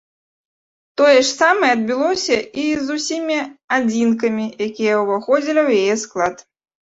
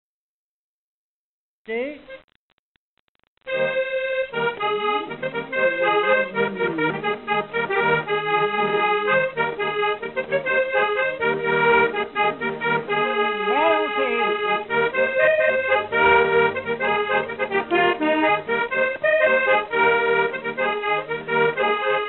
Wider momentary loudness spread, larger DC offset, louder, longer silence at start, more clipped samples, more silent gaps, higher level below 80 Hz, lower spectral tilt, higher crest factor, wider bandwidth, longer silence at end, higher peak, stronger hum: about the same, 9 LU vs 7 LU; neither; first, -17 LUFS vs -21 LUFS; second, 1 s vs 1.7 s; neither; second, 3.64-3.68 s vs 2.24-2.28 s, 2.35-3.19 s, 3.27-3.37 s; about the same, -60 dBFS vs -58 dBFS; first, -3.5 dB/octave vs -1.5 dB/octave; about the same, 16 dB vs 16 dB; first, 8 kHz vs 4.3 kHz; first, 0.5 s vs 0 s; first, -2 dBFS vs -6 dBFS; neither